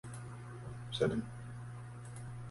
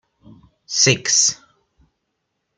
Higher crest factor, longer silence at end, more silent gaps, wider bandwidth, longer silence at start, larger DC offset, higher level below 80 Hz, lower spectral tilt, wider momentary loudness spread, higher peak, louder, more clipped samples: about the same, 24 dB vs 22 dB; second, 0 s vs 1.2 s; neither; about the same, 11.5 kHz vs 11 kHz; second, 0.05 s vs 0.7 s; neither; about the same, -60 dBFS vs -58 dBFS; first, -6 dB/octave vs -1.5 dB/octave; about the same, 13 LU vs 12 LU; second, -18 dBFS vs 0 dBFS; second, -42 LUFS vs -15 LUFS; neither